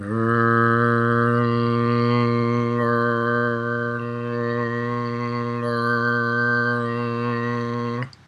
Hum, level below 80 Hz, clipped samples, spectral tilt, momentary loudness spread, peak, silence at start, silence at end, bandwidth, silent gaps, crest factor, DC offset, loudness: none; -64 dBFS; under 0.1%; -8.5 dB/octave; 7 LU; -6 dBFS; 0 s; 0.2 s; 6.6 kHz; none; 16 dB; under 0.1%; -21 LUFS